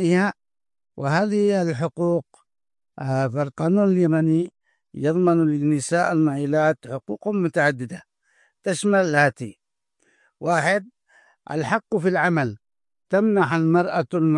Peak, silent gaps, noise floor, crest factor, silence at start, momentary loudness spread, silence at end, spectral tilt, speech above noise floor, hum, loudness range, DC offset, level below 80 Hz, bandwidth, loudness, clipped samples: -4 dBFS; none; -69 dBFS; 18 dB; 0 s; 11 LU; 0 s; -6.5 dB/octave; 49 dB; none; 3 LU; under 0.1%; -68 dBFS; 11.5 kHz; -22 LUFS; under 0.1%